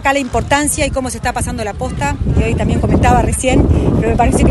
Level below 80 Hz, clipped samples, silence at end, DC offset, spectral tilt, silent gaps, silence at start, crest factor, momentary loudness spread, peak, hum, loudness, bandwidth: -20 dBFS; under 0.1%; 0 s; under 0.1%; -5.5 dB/octave; none; 0 s; 12 dB; 7 LU; 0 dBFS; none; -14 LUFS; 12.5 kHz